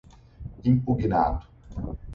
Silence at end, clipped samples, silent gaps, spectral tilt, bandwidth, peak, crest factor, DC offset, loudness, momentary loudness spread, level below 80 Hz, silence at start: 0 s; under 0.1%; none; -10.5 dB/octave; 6.6 kHz; -10 dBFS; 16 dB; under 0.1%; -26 LUFS; 19 LU; -38 dBFS; 0.4 s